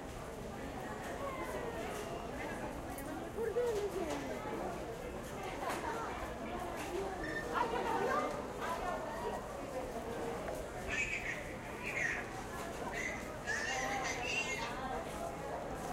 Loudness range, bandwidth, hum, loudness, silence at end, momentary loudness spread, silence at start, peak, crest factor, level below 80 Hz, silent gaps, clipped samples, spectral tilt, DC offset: 3 LU; 16 kHz; none; -40 LUFS; 0 s; 8 LU; 0 s; -22 dBFS; 18 dB; -54 dBFS; none; under 0.1%; -4 dB/octave; under 0.1%